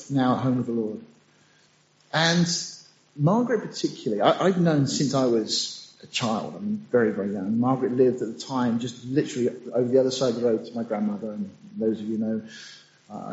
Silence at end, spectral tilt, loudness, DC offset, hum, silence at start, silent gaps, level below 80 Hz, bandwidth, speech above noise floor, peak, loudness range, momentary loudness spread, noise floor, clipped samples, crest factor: 0 s; -5 dB/octave; -25 LUFS; under 0.1%; none; 0 s; none; -68 dBFS; 8 kHz; 36 dB; -6 dBFS; 3 LU; 12 LU; -61 dBFS; under 0.1%; 20 dB